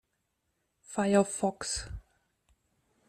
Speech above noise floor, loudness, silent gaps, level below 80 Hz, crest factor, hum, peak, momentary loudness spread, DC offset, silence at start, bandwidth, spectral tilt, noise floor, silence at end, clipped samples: 50 dB; -30 LUFS; none; -54 dBFS; 22 dB; none; -12 dBFS; 17 LU; under 0.1%; 0.9 s; 13 kHz; -4.5 dB/octave; -80 dBFS; 1.1 s; under 0.1%